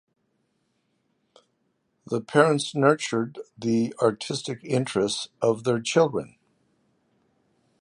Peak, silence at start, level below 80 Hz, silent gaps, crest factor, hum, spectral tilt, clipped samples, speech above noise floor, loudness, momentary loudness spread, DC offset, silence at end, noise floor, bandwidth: -2 dBFS; 2.1 s; -68 dBFS; none; 24 dB; none; -5 dB/octave; under 0.1%; 49 dB; -25 LUFS; 11 LU; under 0.1%; 1.55 s; -73 dBFS; 11 kHz